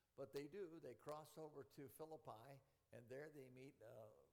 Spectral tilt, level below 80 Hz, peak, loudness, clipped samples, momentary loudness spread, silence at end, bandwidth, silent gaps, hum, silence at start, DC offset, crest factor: -6 dB/octave; -90 dBFS; -40 dBFS; -59 LUFS; under 0.1%; 10 LU; 0 s; 19 kHz; none; none; 0.15 s; under 0.1%; 18 dB